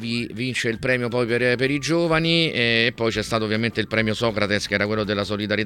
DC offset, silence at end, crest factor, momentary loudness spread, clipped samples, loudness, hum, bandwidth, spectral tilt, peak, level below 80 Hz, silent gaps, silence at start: under 0.1%; 0 s; 20 dB; 5 LU; under 0.1%; -21 LUFS; none; 17 kHz; -5 dB/octave; -2 dBFS; -48 dBFS; none; 0 s